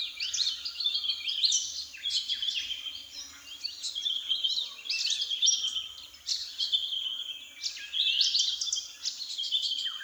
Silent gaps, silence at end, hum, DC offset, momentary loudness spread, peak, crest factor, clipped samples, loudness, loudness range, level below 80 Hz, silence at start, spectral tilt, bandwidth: none; 0 s; none; under 0.1%; 12 LU; -12 dBFS; 20 dB; under 0.1%; -29 LUFS; 2 LU; -72 dBFS; 0 s; 4 dB/octave; over 20 kHz